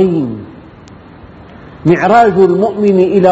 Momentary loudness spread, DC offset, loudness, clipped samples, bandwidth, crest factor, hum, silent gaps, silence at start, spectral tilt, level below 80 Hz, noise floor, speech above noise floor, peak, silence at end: 10 LU; under 0.1%; -10 LUFS; 0.2%; 8 kHz; 12 dB; none; none; 0 s; -8.5 dB/octave; -44 dBFS; -35 dBFS; 26 dB; 0 dBFS; 0 s